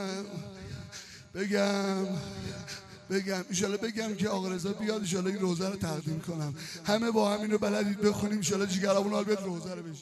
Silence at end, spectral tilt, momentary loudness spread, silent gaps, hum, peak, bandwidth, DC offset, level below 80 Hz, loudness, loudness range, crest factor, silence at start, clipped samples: 0 s; -5 dB/octave; 14 LU; none; none; -12 dBFS; 14 kHz; under 0.1%; -64 dBFS; -31 LUFS; 4 LU; 20 dB; 0 s; under 0.1%